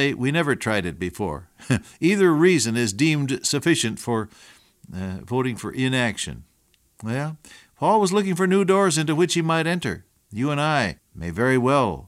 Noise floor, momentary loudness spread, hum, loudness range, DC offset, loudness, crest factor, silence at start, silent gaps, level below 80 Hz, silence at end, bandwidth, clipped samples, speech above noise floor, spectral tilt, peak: -63 dBFS; 14 LU; none; 6 LU; under 0.1%; -22 LUFS; 16 dB; 0 s; none; -52 dBFS; 0 s; 15.5 kHz; under 0.1%; 41 dB; -5 dB/octave; -6 dBFS